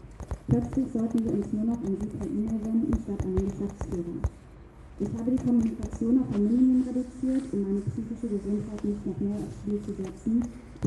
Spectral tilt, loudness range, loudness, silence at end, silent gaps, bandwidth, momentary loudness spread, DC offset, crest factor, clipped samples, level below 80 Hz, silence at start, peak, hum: -9 dB/octave; 4 LU; -29 LUFS; 0 s; none; 11 kHz; 9 LU; under 0.1%; 18 dB; under 0.1%; -42 dBFS; 0 s; -12 dBFS; none